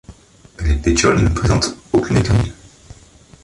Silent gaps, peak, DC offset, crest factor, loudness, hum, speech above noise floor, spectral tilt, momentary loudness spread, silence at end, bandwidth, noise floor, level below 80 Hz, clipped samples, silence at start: none; -2 dBFS; under 0.1%; 16 dB; -17 LUFS; none; 30 dB; -5.5 dB/octave; 7 LU; 0.9 s; 11.5 kHz; -45 dBFS; -26 dBFS; under 0.1%; 0.1 s